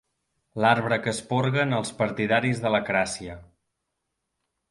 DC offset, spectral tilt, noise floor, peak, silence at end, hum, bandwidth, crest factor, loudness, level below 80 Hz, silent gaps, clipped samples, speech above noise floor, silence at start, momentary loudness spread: under 0.1%; -5 dB/octave; -80 dBFS; -4 dBFS; 1.25 s; none; 11.5 kHz; 22 dB; -24 LUFS; -58 dBFS; none; under 0.1%; 56 dB; 0.55 s; 8 LU